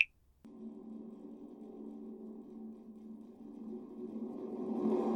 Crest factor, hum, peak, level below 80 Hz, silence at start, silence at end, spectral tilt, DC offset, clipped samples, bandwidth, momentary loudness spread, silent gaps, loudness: 30 dB; none; -10 dBFS; -76 dBFS; 0 s; 0 s; -8 dB/octave; under 0.1%; under 0.1%; 6.4 kHz; 16 LU; none; -43 LUFS